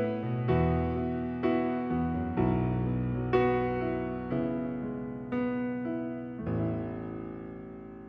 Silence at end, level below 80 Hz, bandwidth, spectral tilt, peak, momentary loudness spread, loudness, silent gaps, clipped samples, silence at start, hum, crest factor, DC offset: 0 s; -46 dBFS; 5.4 kHz; -10.5 dB/octave; -14 dBFS; 11 LU; -31 LUFS; none; under 0.1%; 0 s; none; 16 dB; under 0.1%